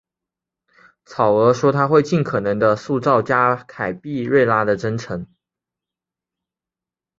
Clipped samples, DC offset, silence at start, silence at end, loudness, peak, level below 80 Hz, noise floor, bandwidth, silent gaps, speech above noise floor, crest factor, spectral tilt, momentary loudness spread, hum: under 0.1%; under 0.1%; 1.1 s; 1.95 s; -18 LUFS; -2 dBFS; -56 dBFS; -89 dBFS; 7.8 kHz; none; 71 dB; 18 dB; -7 dB/octave; 11 LU; none